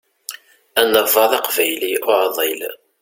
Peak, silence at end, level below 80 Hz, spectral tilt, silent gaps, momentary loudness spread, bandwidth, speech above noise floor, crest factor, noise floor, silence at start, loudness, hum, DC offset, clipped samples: 0 dBFS; 0.25 s; -64 dBFS; -1 dB/octave; none; 18 LU; 17 kHz; 20 dB; 18 dB; -36 dBFS; 0.3 s; -16 LUFS; none; under 0.1%; under 0.1%